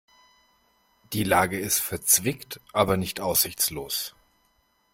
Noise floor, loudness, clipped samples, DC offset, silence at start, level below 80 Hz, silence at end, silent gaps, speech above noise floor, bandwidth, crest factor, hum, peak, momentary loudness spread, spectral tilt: -68 dBFS; -24 LUFS; under 0.1%; under 0.1%; 1.1 s; -54 dBFS; 0.85 s; none; 42 dB; 16.5 kHz; 24 dB; none; -4 dBFS; 10 LU; -2.5 dB/octave